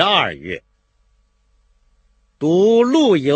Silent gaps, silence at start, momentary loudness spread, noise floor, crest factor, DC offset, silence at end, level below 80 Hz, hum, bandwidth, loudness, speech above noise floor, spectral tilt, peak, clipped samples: none; 0 s; 16 LU; -60 dBFS; 18 dB; under 0.1%; 0 s; -56 dBFS; none; 8.6 kHz; -15 LUFS; 46 dB; -5.5 dB/octave; 0 dBFS; under 0.1%